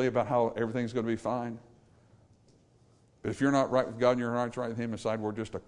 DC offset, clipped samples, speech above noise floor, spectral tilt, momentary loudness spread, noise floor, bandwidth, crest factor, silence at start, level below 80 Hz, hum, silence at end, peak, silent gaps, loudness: under 0.1%; under 0.1%; 33 dB; -6.5 dB/octave; 9 LU; -63 dBFS; 11 kHz; 20 dB; 0 s; -64 dBFS; none; 0.1 s; -12 dBFS; none; -31 LUFS